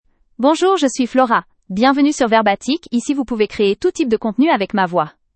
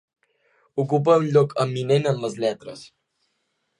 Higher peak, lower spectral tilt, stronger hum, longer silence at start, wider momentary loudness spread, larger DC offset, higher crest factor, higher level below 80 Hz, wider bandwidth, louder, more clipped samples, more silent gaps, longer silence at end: first, 0 dBFS vs -6 dBFS; second, -4.5 dB/octave vs -7 dB/octave; neither; second, 0.4 s vs 0.75 s; second, 6 LU vs 17 LU; neither; about the same, 16 dB vs 18 dB; first, -52 dBFS vs -70 dBFS; second, 8.8 kHz vs 11 kHz; first, -16 LUFS vs -21 LUFS; neither; neither; second, 0.25 s vs 0.95 s